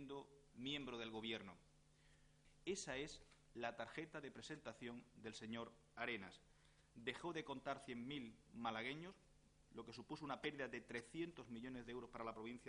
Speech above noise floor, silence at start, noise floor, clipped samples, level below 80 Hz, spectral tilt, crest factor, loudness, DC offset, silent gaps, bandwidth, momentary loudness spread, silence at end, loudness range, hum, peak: 21 dB; 0 s; -73 dBFS; under 0.1%; -74 dBFS; -4 dB/octave; 24 dB; -51 LUFS; under 0.1%; none; 10.5 kHz; 10 LU; 0 s; 2 LU; none; -30 dBFS